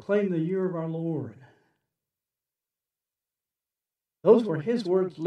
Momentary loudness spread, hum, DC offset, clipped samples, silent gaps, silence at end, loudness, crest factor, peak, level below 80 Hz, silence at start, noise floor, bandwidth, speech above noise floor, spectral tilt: 11 LU; none; under 0.1%; under 0.1%; none; 0 s; -26 LUFS; 22 dB; -6 dBFS; -84 dBFS; 0.1 s; under -90 dBFS; 9 kHz; over 65 dB; -8.5 dB/octave